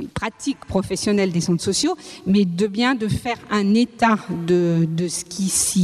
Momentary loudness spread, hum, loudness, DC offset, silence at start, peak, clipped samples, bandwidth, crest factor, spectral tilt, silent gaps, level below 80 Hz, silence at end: 7 LU; none; -20 LUFS; under 0.1%; 0 s; -2 dBFS; under 0.1%; 14.5 kHz; 18 dB; -4.5 dB/octave; none; -48 dBFS; 0 s